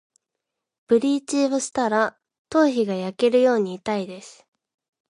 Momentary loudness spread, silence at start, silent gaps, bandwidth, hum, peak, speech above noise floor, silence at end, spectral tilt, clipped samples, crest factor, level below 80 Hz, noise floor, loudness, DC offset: 9 LU; 0.9 s; 2.39-2.45 s; 11.5 kHz; none; -6 dBFS; 62 dB; 0.8 s; -4.5 dB/octave; under 0.1%; 16 dB; -68 dBFS; -83 dBFS; -22 LUFS; under 0.1%